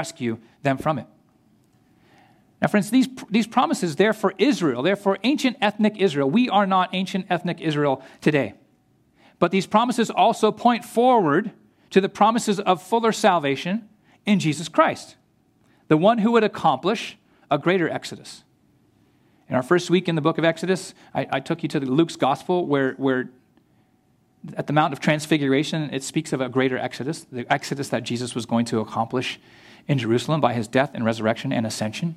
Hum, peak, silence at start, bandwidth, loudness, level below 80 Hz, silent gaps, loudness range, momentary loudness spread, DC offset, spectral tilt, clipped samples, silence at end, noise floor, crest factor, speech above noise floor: none; -2 dBFS; 0 s; 14.5 kHz; -22 LUFS; -66 dBFS; none; 5 LU; 9 LU; under 0.1%; -5.5 dB/octave; under 0.1%; 0 s; -62 dBFS; 20 dB; 41 dB